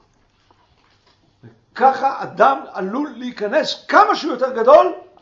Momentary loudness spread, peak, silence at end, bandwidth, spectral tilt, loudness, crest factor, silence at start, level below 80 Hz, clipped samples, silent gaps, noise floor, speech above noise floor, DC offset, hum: 13 LU; 0 dBFS; 0.2 s; 7.6 kHz; -4.5 dB/octave; -16 LUFS; 18 dB; 1.45 s; -62 dBFS; under 0.1%; none; -58 dBFS; 42 dB; under 0.1%; none